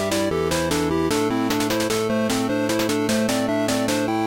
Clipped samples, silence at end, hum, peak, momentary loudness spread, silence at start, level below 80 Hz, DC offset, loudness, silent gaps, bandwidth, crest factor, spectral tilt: under 0.1%; 0 s; none; -8 dBFS; 1 LU; 0 s; -46 dBFS; under 0.1%; -21 LUFS; none; 17 kHz; 12 dB; -4 dB/octave